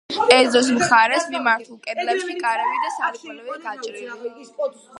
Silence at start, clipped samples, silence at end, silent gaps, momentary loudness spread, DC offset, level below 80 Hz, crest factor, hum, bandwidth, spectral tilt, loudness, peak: 0.1 s; under 0.1%; 0 s; none; 18 LU; under 0.1%; -66 dBFS; 20 dB; none; 11.5 kHz; -2 dB/octave; -19 LUFS; 0 dBFS